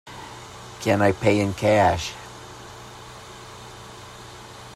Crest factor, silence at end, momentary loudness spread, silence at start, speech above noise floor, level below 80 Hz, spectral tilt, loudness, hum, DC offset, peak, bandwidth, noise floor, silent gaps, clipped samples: 20 dB; 0 s; 21 LU; 0.05 s; 21 dB; -52 dBFS; -5.5 dB/octave; -21 LUFS; none; under 0.1%; -6 dBFS; 15 kHz; -41 dBFS; none; under 0.1%